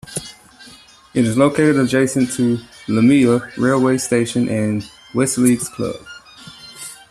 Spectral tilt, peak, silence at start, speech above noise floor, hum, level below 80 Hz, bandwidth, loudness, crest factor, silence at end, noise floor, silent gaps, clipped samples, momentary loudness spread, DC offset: -5.5 dB/octave; -2 dBFS; 0.05 s; 28 dB; none; -52 dBFS; 14 kHz; -17 LUFS; 16 dB; 0.15 s; -44 dBFS; none; under 0.1%; 19 LU; under 0.1%